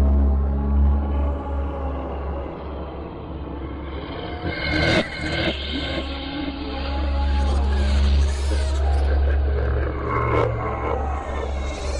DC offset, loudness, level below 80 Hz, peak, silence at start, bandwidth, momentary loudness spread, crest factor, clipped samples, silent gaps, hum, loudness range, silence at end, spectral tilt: under 0.1%; -24 LUFS; -24 dBFS; -8 dBFS; 0 s; 10 kHz; 12 LU; 14 dB; under 0.1%; none; none; 6 LU; 0 s; -6.5 dB/octave